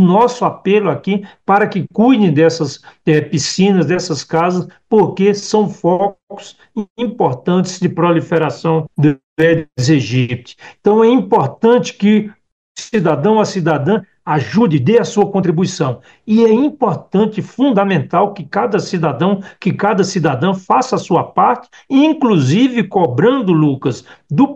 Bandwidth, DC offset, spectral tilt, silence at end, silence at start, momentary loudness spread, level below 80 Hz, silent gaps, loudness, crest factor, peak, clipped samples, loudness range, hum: 8.4 kHz; 0.1%; -6.5 dB/octave; 0 s; 0 s; 8 LU; -56 dBFS; 6.23-6.27 s, 6.90-6.96 s, 9.23-9.36 s, 12.52-12.75 s; -14 LUFS; 14 dB; 0 dBFS; under 0.1%; 3 LU; none